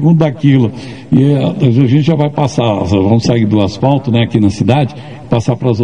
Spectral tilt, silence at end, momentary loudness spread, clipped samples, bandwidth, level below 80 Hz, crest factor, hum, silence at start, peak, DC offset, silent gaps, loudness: -8 dB/octave; 0 s; 5 LU; 0.4%; 9.6 kHz; -42 dBFS; 10 dB; none; 0 s; 0 dBFS; 0.9%; none; -12 LUFS